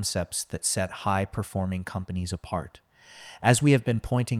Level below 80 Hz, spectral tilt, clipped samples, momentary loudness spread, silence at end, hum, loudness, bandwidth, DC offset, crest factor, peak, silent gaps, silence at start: -50 dBFS; -5 dB/octave; under 0.1%; 12 LU; 0 s; none; -27 LUFS; 15.5 kHz; under 0.1%; 22 dB; -4 dBFS; none; 0 s